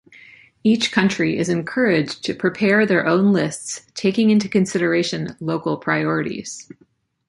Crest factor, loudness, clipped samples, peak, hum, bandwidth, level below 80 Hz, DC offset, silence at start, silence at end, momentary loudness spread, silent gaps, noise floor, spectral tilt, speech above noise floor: 18 dB; -19 LUFS; under 0.1%; -2 dBFS; none; 11.5 kHz; -58 dBFS; under 0.1%; 0.65 s; 0.65 s; 10 LU; none; -47 dBFS; -5 dB/octave; 28 dB